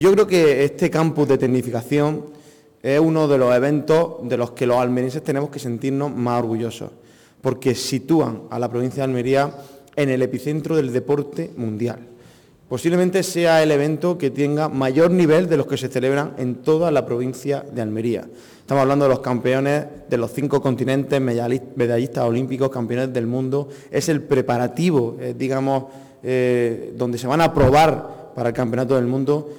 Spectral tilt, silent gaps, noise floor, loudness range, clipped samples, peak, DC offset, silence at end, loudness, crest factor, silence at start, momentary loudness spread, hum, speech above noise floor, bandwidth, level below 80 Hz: -6.5 dB/octave; none; -49 dBFS; 4 LU; under 0.1%; -8 dBFS; under 0.1%; 0 s; -20 LUFS; 12 dB; 0 s; 10 LU; none; 30 dB; 19.5 kHz; -48 dBFS